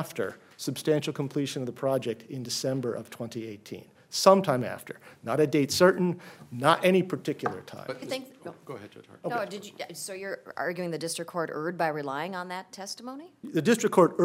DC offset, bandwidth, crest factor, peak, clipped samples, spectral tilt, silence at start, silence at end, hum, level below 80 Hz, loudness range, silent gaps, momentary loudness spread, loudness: under 0.1%; 16 kHz; 24 dB; -4 dBFS; under 0.1%; -5 dB/octave; 0 s; 0 s; none; -74 dBFS; 10 LU; none; 19 LU; -28 LUFS